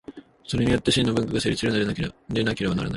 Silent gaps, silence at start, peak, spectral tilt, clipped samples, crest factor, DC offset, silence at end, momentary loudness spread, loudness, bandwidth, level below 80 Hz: none; 0.1 s; -6 dBFS; -5.5 dB/octave; under 0.1%; 18 dB; under 0.1%; 0 s; 9 LU; -24 LUFS; 11.5 kHz; -44 dBFS